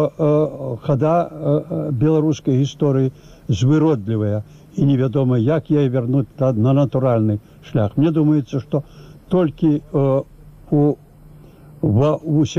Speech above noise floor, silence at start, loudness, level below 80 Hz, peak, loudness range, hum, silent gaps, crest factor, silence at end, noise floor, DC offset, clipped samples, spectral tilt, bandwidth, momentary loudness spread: 26 dB; 0 s; -18 LUFS; -48 dBFS; -8 dBFS; 2 LU; none; none; 10 dB; 0 s; -43 dBFS; 0.2%; under 0.1%; -9 dB/octave; 7.4 kHz; 8 LU